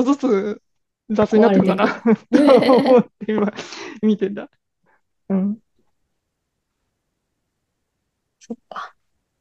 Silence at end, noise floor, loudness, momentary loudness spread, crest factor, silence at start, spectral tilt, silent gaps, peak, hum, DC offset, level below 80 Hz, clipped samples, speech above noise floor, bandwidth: 0.55 s; -76 dBFS; -17 LUFS; 21 LU; 18 dB; 0 s; -7 dB/octave; none; -2 dBFS; none; under 0.1%; -62 dBFS; under 0.1%; 59 dB; 11.5 kHz